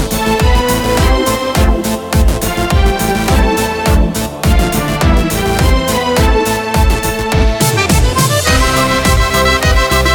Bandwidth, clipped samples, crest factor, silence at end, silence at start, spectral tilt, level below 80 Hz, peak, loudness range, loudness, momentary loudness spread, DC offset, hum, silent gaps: 18 kHz; under 0.1%; 10 dB; 0 s; 0 s; -4.5 dB/octave; -16 dBFS; 0 dBFS; 2 LU; -12 LUFS; 3 LU; under 0.1%; none; none